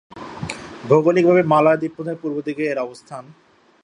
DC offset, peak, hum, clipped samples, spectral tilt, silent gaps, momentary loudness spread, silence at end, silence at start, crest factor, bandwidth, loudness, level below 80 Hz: under 0.1%; -2 dBFS; none; under 0.1%; -7 dB/octave; none; 21 LU; 0.65 s; 0.15 s; 18 dB; 11 kHz; -18 LUFS; -56 dBFS